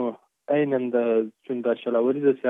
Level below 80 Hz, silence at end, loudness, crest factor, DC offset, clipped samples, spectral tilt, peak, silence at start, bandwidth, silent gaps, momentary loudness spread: -86 dBFS; 0 s; -24 LUFS; 14 dB; under 0.1%; under 0.1%; -9.5 dB/octave; -10 dBFS; 0 s; 3.9 kHz; none; 9 LU